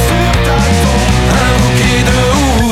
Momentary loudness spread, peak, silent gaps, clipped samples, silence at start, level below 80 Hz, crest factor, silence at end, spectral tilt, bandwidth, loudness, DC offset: 1 LU; 0 dBFS; none; under 0.1%; 0 s; -16 dBFS; 10 dB; 0 s; -5 dB/octave; 16 kHz; -10 LUFS; under 0.1%